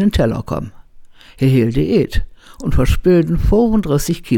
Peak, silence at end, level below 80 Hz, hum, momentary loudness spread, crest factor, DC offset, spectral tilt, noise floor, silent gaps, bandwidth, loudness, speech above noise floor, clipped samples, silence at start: -2 dBFS; 0 s; -24 dBFS; none; 12 LU; 12 dB; under 0.1%; -7 dB/octave; -39 dBFS; none; 18 kHz; -16 LUFS; 25 dB; under 0.1%; 0 s